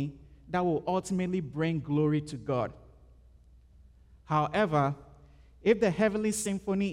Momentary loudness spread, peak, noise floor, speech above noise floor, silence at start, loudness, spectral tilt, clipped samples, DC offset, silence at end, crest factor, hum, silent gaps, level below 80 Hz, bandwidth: 7 LU; -12 dBFS; -57 dBFS; 28 dB; 0 s; -30 LUFS; -6 dB/octave; under 0.1%; under 0.1%; 0 s; 20 dB; none; none; -56 dBFS; 15.5 kHz